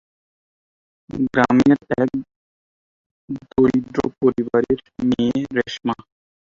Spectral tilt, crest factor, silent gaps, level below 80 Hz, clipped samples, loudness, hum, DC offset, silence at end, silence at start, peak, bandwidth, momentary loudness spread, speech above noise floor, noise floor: -7 dB/octave; 20 dB; 2.36-3.28 s; -50 dBFS; under 0.1%; -20 LUFS; none; under 0.1%; 0.6 s; 1.1 s; -2 dBFS; 7.4 kHz; 13 LU; over 71 dB; under -90 dBFS